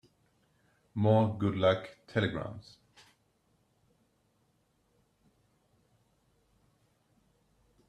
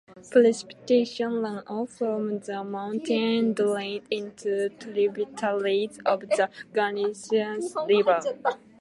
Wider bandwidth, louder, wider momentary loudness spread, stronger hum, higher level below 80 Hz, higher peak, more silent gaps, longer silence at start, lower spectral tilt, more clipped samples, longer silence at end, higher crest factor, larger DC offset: second, 8.8 kHz vs 11.5 kHz; second, -30 LUFS vs -26 LUFS; first, 16 LU vs 10 LU; neither; first, -68 dBFS vs -74 dBFS; second, -14 dBFS vs -6 dBFS; neither; first, 0.95 s vs 0.1 s; first, -8 dB/octave vs -5 dB/octave; neither; first, 5.3 s vs 0.25 s; about the same, 22 dB vs 20 dB; neither